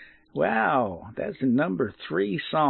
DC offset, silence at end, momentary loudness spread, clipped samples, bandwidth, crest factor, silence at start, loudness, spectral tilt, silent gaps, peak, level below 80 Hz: under 0.1%; 0 s; 10 LU; under 0.1%; 4.4 kHz; 16 dB; 0 s; -26 LUFS; -10.5 dB/octave; none; -10 dBFS; -62 dBFS